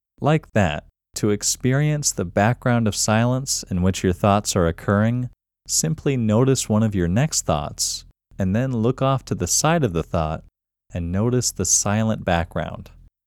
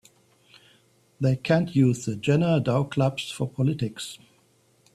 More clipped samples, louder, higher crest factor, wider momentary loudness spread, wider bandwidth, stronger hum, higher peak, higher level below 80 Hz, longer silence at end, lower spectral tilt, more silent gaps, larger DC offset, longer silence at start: neither; first, -21 LUFS vs -25 LUFS; about the same, 18 dB vs 18 dB; about the same, 9 LU vs 10 LU; first, 18 kHz vs 13 kHz; neither; first, -2 dBFS vs -6 dBFS; first, -42 dBFS vs -60 dBFS; second, 0.4 s vs 0.8 s; second, -4.5 dB/octave vs -6.5 dB/octave; neither; neither; second, 0.2 s vs 1.2 s